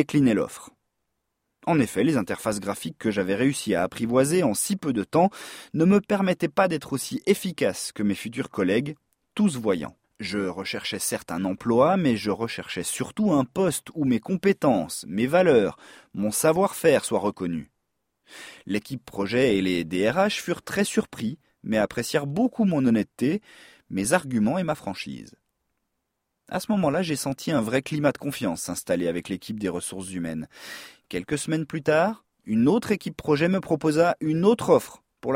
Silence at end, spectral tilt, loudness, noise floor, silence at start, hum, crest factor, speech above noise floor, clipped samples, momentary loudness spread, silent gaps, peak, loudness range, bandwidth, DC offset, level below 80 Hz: 0 s; -5 dB/octave; -25 LUFS; -79 dBFS; 0 s; none; 20 dB; 55 dB; under 0.1%; 12 LU; none; -6 dBFS; 5 LU; 16.5 kHz; under 0.1%; -58 dBFS